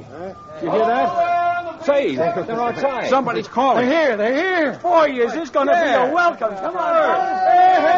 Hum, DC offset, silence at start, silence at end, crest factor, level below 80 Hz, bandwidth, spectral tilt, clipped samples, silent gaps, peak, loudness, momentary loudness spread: none; under 0.1%; 0 s; 0 s; 14 dB; -58 dBFS; 7.4 kHz; -2.5 dB/octave; under 0.1%; none; -4 dBFS; -18 LUFS; 7 LU